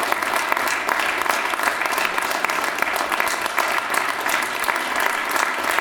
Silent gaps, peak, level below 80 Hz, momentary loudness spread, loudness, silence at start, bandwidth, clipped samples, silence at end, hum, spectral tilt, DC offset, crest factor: none; -2 dBFS; -58 dBFS; 1 LU; -21 LUFS; 0 s; over 20 kHz; under 0.1%; 0 s; none; -0.5 dB/octave; under 0.1%; 20 dB